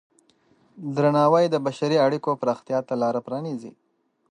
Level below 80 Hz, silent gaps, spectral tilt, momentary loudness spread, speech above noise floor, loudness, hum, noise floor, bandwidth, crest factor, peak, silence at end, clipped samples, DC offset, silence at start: -76 dBFS; none; -7 dB/octave; 12 LU; 39 dB; -23 LUFS; none; -62 dBFS; 9.8 kHz; 18 dB; -6 dBFS; 0.6 s; under 0.1%; under 0.1%; 0.75 s